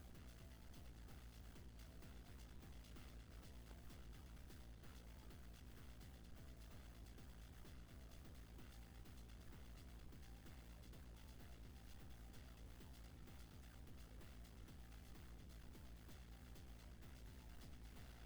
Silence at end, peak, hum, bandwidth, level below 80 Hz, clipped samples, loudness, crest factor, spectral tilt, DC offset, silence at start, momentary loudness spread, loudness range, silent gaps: 0 s; -44 dBFS; none; over 20 kHz; -62 dBFS; under 0.1%; -61 LUFS; 14 dB; -5 dB/octave; under 0.1%; 0 s; 1 LU; 0 LU; none